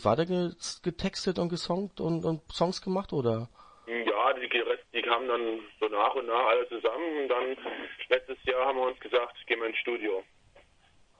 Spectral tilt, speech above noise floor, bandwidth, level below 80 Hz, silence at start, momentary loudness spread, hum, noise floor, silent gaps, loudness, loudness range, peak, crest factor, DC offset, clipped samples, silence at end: -5 dB/octave; 32 dB; 10 kHz; -60 dBFS; 0 s; 8 LU; none; -62 dBFS; none; -30 LUFS; 3 LU; -8 dBFS; 22 dB; under 0.1%; under 0.1%; 0.6 s